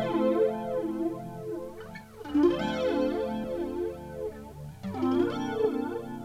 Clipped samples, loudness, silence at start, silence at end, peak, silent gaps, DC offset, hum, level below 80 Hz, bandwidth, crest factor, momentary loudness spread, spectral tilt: under 0.1%; -30 LUFS; 0 s; 0 s; -14 dBFS; none; under 0.1%; 50 Hz at -60 dBFS; -54 dBFS; 15.5 kHz; 16 dB; 15 LU; -7 dB/octave